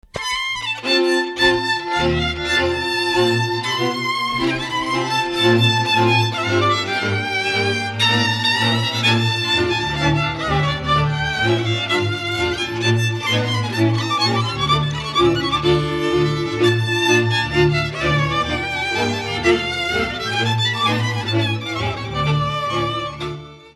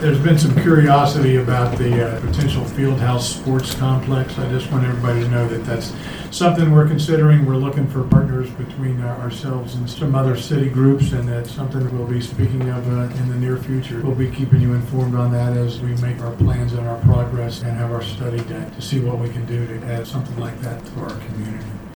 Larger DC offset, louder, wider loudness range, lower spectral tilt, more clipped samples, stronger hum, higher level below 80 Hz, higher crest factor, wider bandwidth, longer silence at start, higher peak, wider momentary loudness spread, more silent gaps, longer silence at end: neither; about the same, -18 LUFS vs -19 LUFS; second, 2 LU vs 5 LU; second, -5 dB/octave vs -7 dB/octave; neither; neither; about the same, -40 dBFS vs -36 dBFS; about the same, 16 dB vs 18 dB; second, 12.5 kHz vs 19.5 kHz; first, 0.15 s vs 0 s; about the same, -2 dBFS vs 0 dBFS; second, 5 LU vs 12 LU; neither; about the same, 0.05 s vs 0.05 s